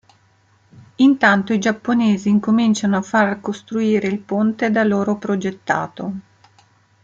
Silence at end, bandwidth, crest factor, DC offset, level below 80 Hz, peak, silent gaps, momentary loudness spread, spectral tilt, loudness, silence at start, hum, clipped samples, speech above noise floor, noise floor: 0.85 s; 7.6 kHz; 16 dB; under 0.1%; -62 dBFS; -2 dBFS; none; 9 LU; -6 dB/octave; -18 LUFS; 1 s; none; under 0.1%; 39 dB; -57 dBFS